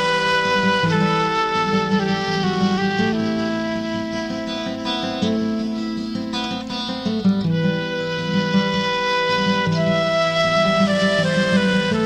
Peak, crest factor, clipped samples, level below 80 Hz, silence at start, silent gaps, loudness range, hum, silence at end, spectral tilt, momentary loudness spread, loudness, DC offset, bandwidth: -8 dBFS; 12 dB; under 0.1%; -50 dBFS; 0 s; none; 5 LU; none; 0 s; -5.5 dB/octave; 8 LU; -20 LUFS; under 0.1%; 10 kHz